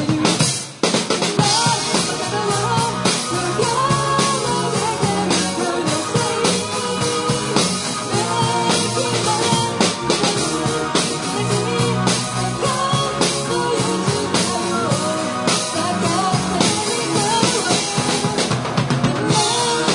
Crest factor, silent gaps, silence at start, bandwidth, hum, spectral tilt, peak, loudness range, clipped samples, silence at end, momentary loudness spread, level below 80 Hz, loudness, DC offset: 18 dB; none; 0 s; 11 kHz; none; -3.5 dB/octave; 0 dBFS; 1 LU; under 0.1%; 0 s; 4 LU; -50 dBFS; -18 LUFS; under 0.1%